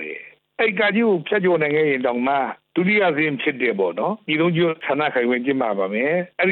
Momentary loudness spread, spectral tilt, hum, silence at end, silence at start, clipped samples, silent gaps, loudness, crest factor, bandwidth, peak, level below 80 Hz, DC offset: 5 LU; -9.5 dB/octave; none; 0 s; 0 s; under 0.1%; none; -20 LUFS; 14 dB; 4.4 kHz; -6 dBFS; -68 dBFS; under 0.1%